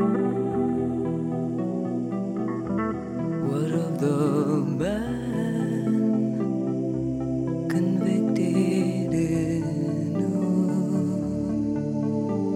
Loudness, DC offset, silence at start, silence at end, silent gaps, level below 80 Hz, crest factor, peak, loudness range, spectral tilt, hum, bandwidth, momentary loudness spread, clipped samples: -26 LUFS; under 0.1%; 0 s; 0 s; none; -52 dBFS; 14 dB; -10 dBFS; 3 LU; -8.5 dB/octave; none; 12.5 kHz; 5 LU; under 0.1%